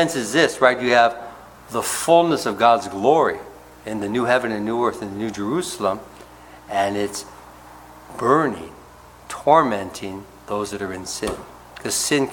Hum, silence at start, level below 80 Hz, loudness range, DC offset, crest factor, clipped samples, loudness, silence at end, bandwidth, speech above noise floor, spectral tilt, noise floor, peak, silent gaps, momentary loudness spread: none; 0 s; -54 dBFS; 7 LU; under 0.1%; 20 dB; under 0.1%; -20 LUFS; 0 s; 18 kHz; 25 dB; -3.5 dB/octave; -45 dBFS; -2 dBFS; none; 18 LU